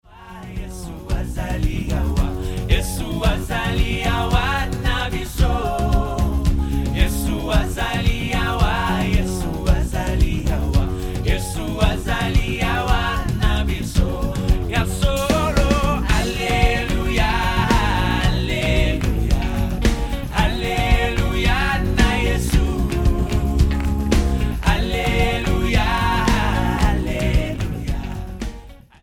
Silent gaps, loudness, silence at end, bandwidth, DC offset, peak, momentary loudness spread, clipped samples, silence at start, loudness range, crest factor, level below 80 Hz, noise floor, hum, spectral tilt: none; -20 LUFS; 0.25 s; 17 kHz; under 0.1%; 0 dBFS; 7 LU; under 0.1%; 0.1 s; 2 LU; 18 dB; -22 dBFS; -39 dBFS; none; -5.5 dB/octave